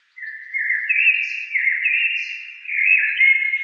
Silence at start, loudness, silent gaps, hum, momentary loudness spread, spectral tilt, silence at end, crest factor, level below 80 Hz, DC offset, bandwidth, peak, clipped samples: 0.15 s; -17 LUFS; none; none; 14 LU; 10 dB/octave; 0 s; 16 dB; under -90 dBFS; under 0.1%; 7 kHz; -4 dBFS; under 0.1%